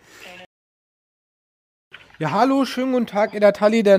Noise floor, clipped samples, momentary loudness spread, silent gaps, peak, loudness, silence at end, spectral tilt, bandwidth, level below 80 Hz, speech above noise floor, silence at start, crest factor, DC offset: under -90 dBFS; under 0.1%; 23 LU; 0.46-1.91 s; -2 dBFS; -19 LUFS; 0 s; -6 dB/octave; 15.5 kHz; -68 dBFS; over 73 dB; 0.2 s; 18 dB; under 0.1%